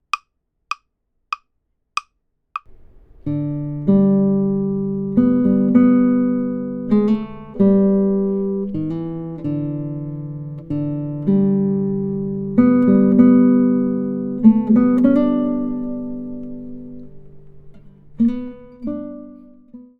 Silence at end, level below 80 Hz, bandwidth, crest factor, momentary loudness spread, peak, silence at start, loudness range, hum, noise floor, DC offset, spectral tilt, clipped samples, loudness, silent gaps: 0.2 s; -48 dBFS; 6.2 kHz; 18 dB; 17 LU; 0 dBFS; 0.15 s; 13 LU; none; -70 dBFS; under 0.1%; -9.5 dB/octave; under 0.1%; -18 LUFS; none